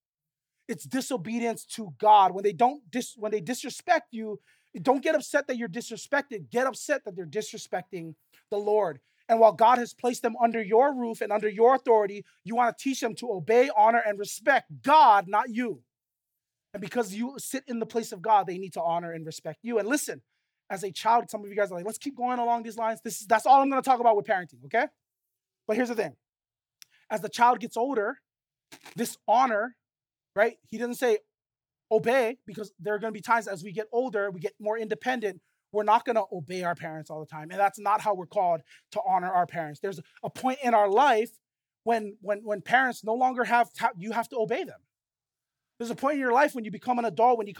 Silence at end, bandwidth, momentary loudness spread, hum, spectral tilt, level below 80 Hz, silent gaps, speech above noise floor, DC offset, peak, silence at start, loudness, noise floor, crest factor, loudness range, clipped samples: 0 s; 18.5 kHz; 14 LU; none; -4 dB/octave; -86 dBFS; none; over 64 dB; under 0.1%; -6 dBFS; 0.7 s; -26 LUFS; under -90 dBFS; 20 dB; 6 LU; under 0.1%